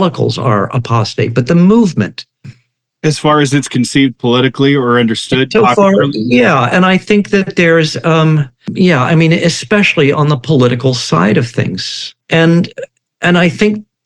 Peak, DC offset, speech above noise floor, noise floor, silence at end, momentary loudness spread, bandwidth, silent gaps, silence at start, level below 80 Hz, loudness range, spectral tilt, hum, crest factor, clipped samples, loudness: 0 dBFS; under 0.1%; 46 dB; -56 dBFS; 0.25 s; 7 LU; 11 kHz; none; 0 s; -48 dBFS; 3 LU; -6 dB/octave; none; 10 dB; under 0.1%; -11 LUFS